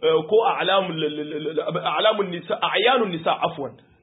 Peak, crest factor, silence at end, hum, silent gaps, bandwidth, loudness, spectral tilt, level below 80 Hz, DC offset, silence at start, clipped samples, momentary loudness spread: -6 dBFS; 16 dB; 0.3 s; none; none; 4 kHz; -22 LUFS; -9.5 dB/octave; -70 dBFS; under 0.1%; 0 s; under 0.1%; 8 LU